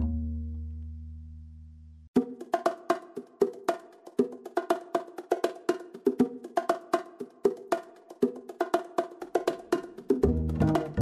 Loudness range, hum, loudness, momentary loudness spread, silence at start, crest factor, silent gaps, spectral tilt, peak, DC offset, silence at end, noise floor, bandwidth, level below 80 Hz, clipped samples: 2 LU; none; -31 LUFS; 16 LU; 0 s; 18 dB; 2.08-2.14 s; -7 dB/octave; -12 dBFS; under 0.1%; 0 s; -49 dBFS; 13.5 kHz; -44 dBFS; under 0.1%